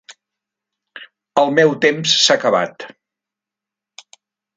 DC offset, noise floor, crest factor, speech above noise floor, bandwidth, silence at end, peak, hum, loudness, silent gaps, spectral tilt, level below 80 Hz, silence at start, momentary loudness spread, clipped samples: under 0.1%; -86 dBFS; 20 dB; 71 dB; 9.6 kHz; 1.7 s; 0 dBFS; none; -15 LUFS; none; -2.5 dB/octave; -70 dBFS; 0.95 s; 16 LU; under 0.1%